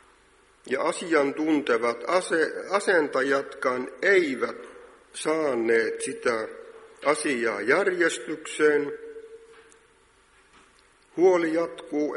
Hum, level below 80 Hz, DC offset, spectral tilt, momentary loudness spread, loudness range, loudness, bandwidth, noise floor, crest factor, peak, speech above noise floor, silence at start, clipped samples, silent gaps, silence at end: none; -70 dBFS; under 0.1%; -3.5 dB/octave; 12 LU; 4 LU; -25 LUFS; 11.5 kHz; -60 dBFS; 20 dB; -6 dBFS; 35 dB; 0.65 s; under 0.1%; none; 0 s